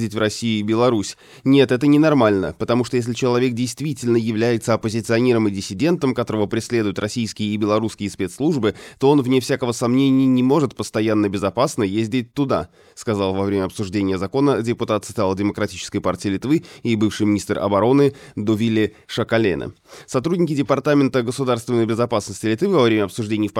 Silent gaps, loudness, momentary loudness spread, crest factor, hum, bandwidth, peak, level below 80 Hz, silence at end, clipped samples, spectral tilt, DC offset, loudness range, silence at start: none; -19 LUFS; 8 LU; 16 dB; none; 15 kHz; -2 dBFS; -54 dBFS; 0 s; under 0.1%; -6 dB/octave; under 0.1%; 4 LU; 0 s